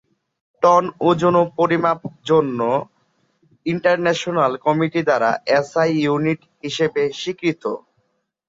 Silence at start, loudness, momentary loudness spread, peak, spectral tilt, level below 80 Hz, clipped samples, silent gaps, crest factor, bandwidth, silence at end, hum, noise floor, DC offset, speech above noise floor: 0.6 s; -19 LUFS; 10 LU; -2 dBFS; -6 dB/octave; -62 dBFS; under 0.1%; none; 18 dB; 7.8 kHz; 0.7 s; none; -68 dBFS; under 0.1%; 50 dB